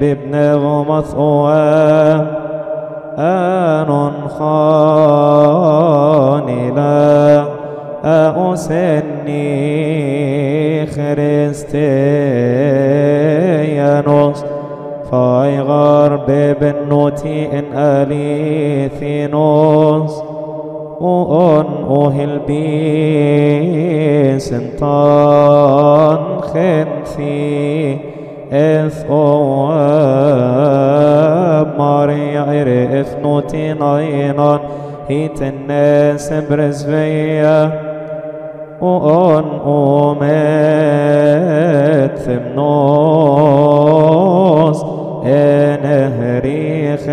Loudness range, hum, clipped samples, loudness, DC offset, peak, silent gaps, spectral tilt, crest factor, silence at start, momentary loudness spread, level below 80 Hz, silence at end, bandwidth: 4 LU; none; under 0.1%; -12 LUFS; under 0.1%; 0 dBFS; none; -8.5 dB/octave; 12 dB; 0 s; 10 LU; -44 dBFS; 0 s; 10 kHz